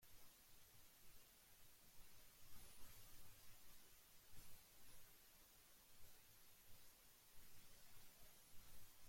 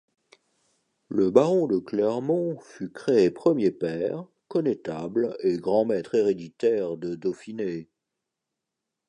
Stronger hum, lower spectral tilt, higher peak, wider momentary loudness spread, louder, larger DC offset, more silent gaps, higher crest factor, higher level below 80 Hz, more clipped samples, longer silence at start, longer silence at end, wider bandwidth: neither; second, -2 dB/octave vs -7.5 dB/octave; second, -44 dBFS vs -4 dBFS; second, 4 LU vs 11 LU; second, -67 LUFS vs -25 LUFS; neither; neither; second, 16 dB vs 22 dB; second, -74 dBFS vs -68 dBFS; neither; second, 0 s vs 1.1 s; second, 0 s vs 1.25 s; first, 16.5 kHz vs 10 kHz